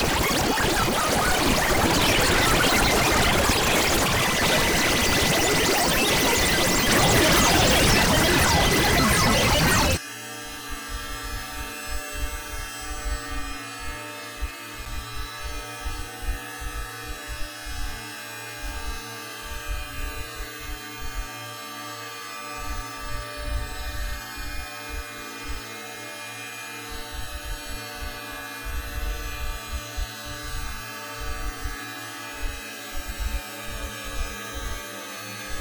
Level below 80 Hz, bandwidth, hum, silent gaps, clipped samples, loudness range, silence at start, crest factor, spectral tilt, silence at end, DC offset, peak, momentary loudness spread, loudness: -34 dBFS; over 20 kHz; none; none; under 0.1%; 16 LU; 0 s; 18 dB; -3 dB/octave; 0 s; under 0.1%; -6 dBFS; 16 LU; -24 LUFS